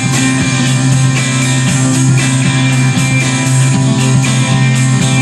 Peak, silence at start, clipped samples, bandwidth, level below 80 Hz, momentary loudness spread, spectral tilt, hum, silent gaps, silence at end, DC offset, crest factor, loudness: 0 dBFS; 0 s; under 0.1%; 12.5 kHz; -40 dBFS; 1 LU; -4.5 dB/octave; none; none; 0 s; under 0.1%; 10 dB; -11 LUFS